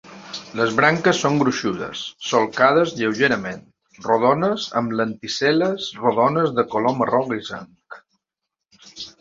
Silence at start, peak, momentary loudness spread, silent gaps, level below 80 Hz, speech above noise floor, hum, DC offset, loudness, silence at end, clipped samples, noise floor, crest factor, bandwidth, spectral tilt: 0.05 s; -2 dBFS; 16 LU; none; -60 dBFS; 63 dB; none; under 0.1%; -20 LUFS; 0.1 s; under 0.1%; -83 dBFS; 20 dB; 7.8 kHz; -5 dB/octave